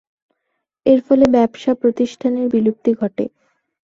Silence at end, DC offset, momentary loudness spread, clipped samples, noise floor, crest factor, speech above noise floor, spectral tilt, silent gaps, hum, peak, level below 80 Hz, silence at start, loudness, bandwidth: 0.6 s; under 0.1%; 9 LU; under 0.1%; -75 dBFS; 16 dB; 59 dB; -7 dB/octave; none; none; -2 dBFS; -54 dBFS; 0.85 s; -17 LUFS; 7.6 kHz